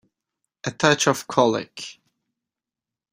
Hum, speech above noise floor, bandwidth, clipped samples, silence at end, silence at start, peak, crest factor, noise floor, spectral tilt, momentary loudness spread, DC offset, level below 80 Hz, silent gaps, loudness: none; 68 dB; 16 kHz; under 0.1%; 1.2 s; 0.65 s; -2 dBFS; 24 dB; -89 dBFS; -3.5 dB/octave; 18 LU; under 0.1%; -62 dBFS; none; -20 LUFS